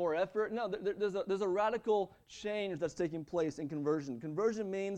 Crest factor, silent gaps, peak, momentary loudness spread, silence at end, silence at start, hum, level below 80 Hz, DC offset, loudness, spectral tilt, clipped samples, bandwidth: 14 dB; none; -20 dBFS; 5 LU; 0 s; 0 s; none; -70 dBFS; under 0.1%; -36 LUFS; -6 dB/octave; under 0.1%; 9.4 kHz